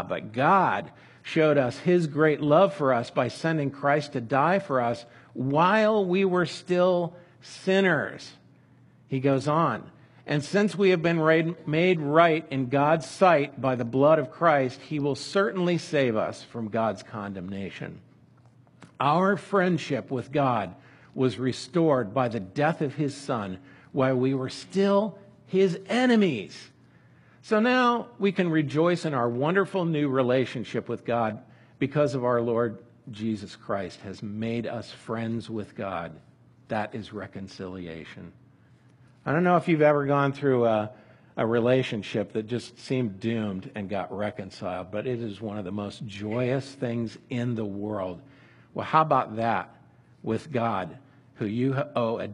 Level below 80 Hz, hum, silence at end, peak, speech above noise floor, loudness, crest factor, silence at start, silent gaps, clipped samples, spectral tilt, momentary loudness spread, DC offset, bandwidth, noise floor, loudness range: -68 dBFS; none; 0 s; -4 dBFS; 31 dB; -26 LUFS; 22 dB; 0 s; none; under 0.1%; -7 dB/octave; 14 LU; under 0.1%; 11.5 kHz; -57 dBFS; 8 LU